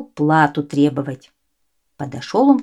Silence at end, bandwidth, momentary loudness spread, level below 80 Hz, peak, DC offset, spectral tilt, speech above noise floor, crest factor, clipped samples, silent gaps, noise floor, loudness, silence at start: 0 s; 10.5 kHz; 16 LU; -62 dBFS; -2 dBFS; under 0.1%; -7 dB/octave; 55 dB; 18 dB; under 0.1%; none; -72 dBFS; -17 LUFS; 0 s